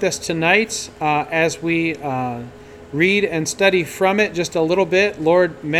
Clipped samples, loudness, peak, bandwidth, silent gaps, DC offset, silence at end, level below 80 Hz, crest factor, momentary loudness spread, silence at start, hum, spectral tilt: under 0.1%; -18 LUFS; 0 dBFS; 15.5 kHz; none; under 0.1%; 0 s; -52 dBFS; 18 dB; 8 LU; 0 s; none; -4 dB/octave